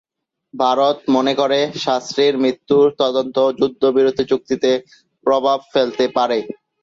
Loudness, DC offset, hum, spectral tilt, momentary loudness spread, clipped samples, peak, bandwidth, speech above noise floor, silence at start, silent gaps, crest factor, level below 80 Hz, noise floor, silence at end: -17 LUFS; under 0.1%; none; -5 dB/octave; 5 LU; under 0.1%; -2 dBFS; 7.6 kHz; 39 dB; 0.55 s; none; 14 dB; -60 dBFS; -56 dBFS; 0.3 s